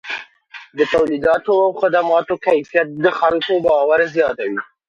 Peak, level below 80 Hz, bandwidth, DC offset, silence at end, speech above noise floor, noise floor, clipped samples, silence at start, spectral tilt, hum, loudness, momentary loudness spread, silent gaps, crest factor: 0 dBFS; -54 dBFS; 7.4 kHz; under 0.1%; 0.25 s; 25 dB; -41 dBFS; under 0.1%; 0.05 s; -5.5 dB/octave; none; -16 LUFS; 9 LU; none; 16 dB